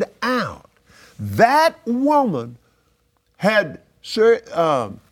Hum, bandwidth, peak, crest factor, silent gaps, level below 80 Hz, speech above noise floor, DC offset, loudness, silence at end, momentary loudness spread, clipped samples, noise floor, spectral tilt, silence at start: none; 18 kHz; 0 dBFS; 20 dB; none; -60 dBFS; 46 dB; under 0.1%; -19 LUFS; 0.15 s; 14 LU; under 0.1%; -64 dBFS; -5.5 dB/octave; 0 s